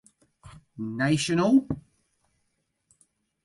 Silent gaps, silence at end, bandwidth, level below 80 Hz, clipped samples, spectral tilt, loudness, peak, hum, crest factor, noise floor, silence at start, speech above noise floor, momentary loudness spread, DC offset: none; 1.65 s; 11.5 kHz; -58 dBFS; under 0.1%; -5.5 dB/octave; -25 LUFS; -10 dBFS; none; 18 dB; -76 dBFS; 0.45 s; 52 dB; 16 LU; under 0.1%